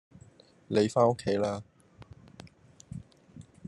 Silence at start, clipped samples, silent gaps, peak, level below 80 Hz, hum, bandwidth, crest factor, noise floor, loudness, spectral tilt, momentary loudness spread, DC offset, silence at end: 0.7 s; under 0.1%; none; -10 dBFS; -64 dBFS; none; 11.5 kHz; 22 dB; -57 dBFS; -28 LUFS; -6.5 dB/octave; 26 LU; under 0.1%; 0 s